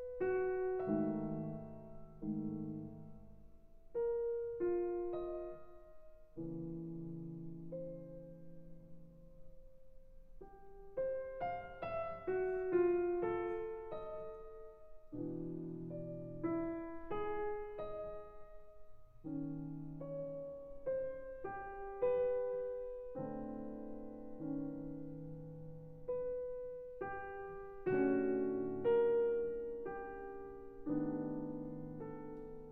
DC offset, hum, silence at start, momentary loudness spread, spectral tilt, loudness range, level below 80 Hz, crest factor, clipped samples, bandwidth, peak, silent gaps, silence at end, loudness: under 0.1%; none; 0 s; 19 LU; -10.5 dB/octave; 12 LU; -60 dBFS; 18 dB; under 0.1%; 4.1 kHz; -24 dBFS; none; 0 s; -41 LUFS